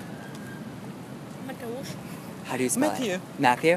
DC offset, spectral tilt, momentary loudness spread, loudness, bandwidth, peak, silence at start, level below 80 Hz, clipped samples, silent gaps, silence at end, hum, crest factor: under 0.1%; -4 dB/octave; 15 LU; -30 LUFS; 15.5 kHz; -4 dBFS; 0 s; -66 dBFS; under 0.1%; none; 0 s; none; 24 dB